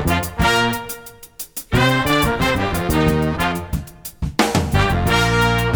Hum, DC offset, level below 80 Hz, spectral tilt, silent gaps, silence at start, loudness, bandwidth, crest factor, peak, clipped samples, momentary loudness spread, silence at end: none; under 0.1%; -30 dBFS; -5 dB/octave; none; 0 s; -18 LUFS; over 20 kHz; 16 dB; -2 dBFS; under 0.1%; 14 LU; 0 s